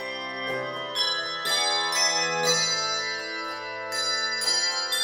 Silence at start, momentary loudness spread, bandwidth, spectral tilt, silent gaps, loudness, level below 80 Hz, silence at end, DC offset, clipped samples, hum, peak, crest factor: 0 s; 9 LU; 17 kHz; 0 dB/octave; none; -24 LUFS; -70 dBFS; 0 s; under 0.1%; under 0.1%; none; -10 dBFS; 16 dB